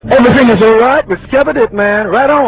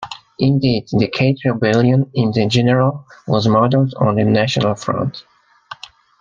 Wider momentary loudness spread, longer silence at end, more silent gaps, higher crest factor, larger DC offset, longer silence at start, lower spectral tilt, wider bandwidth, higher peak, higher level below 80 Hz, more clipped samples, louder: second, 5 LU vs 15 LU; second, 0 s vs 0.45 s; neither; second, 8 dB vs 14 dB; neither; about the same, 0.05 s vs 0 s; first, -10 dB/octave vs -7 dB/octave; second, 4 kHz vs 7.4 kHz; about the same, 0 dBFS vs -2 dBFS; first, -34 dBFS vs -50 dBFS; first, 0.5% vs under 0.1%; first, -9 LUFS vs -16 LUFS